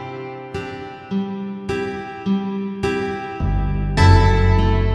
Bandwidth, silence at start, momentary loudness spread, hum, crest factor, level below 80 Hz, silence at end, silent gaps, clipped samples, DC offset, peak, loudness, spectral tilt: 10.5 kHz; 0 s; 16 LU; none; 18 dB; -24 dBFS; 0 s; none; under 0.1%; under 0.1%; 0 dBFS; -20 LUFS; -7 dB/octave